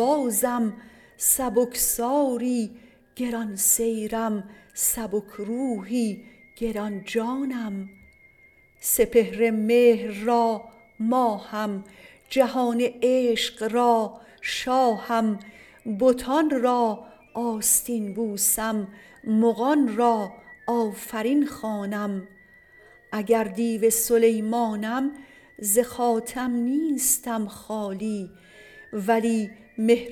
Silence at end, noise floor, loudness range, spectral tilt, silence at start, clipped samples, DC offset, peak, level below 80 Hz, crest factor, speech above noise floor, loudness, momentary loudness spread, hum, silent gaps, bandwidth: 0 s; -57 dBFS; 4 LU; -3.5 dB/octave; 0 s; under 0.1%; under 0.1%; -6 dBFS; -56 dBFS; 18 dB; 33 dB; -24 LUFS; 12 LU; none; none; 19 kHz